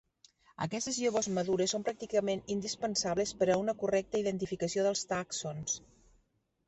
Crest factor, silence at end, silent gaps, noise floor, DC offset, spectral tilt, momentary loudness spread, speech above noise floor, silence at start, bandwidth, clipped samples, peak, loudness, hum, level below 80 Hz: 18 dB; 0.9 s; none; -75 dBFS; under 0.1%; -4 dB/octave; 6 LU; 42 dB; 0.6 s; 8.4 kHz; under 0.1%; -16 dBFS; -33 LUFS; none; -64 dBFS